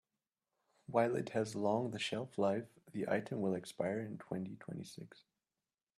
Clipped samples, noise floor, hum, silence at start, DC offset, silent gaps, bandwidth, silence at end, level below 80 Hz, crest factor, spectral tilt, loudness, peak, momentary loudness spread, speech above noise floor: under 0.1%; under -90 dBFS; none; 0.9 s; under 0.1%; none; 13.5 kHz; 0.9 s; -80 dBFS; 22 dB; -6 dB/octave; -39 LUFS; -18 dBFS; 13 LU; over 52 dB